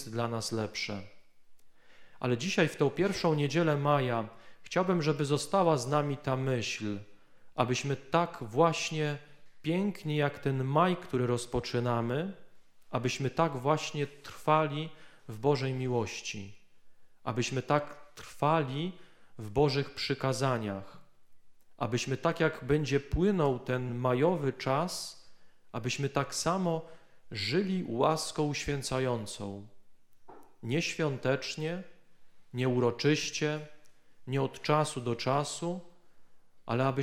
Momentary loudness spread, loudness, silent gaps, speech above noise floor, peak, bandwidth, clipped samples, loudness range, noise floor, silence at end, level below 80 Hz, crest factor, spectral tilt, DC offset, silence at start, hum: 12 LU; -31 LUFS; none; 20 dB; -10 dBFS; 15.5 kHz; under 0.1%; 4 LU; -51 dBFS; 0 s; -56 dBFS; 22 dB; -5.5 dB/octave; under 0.1%; 0 s; none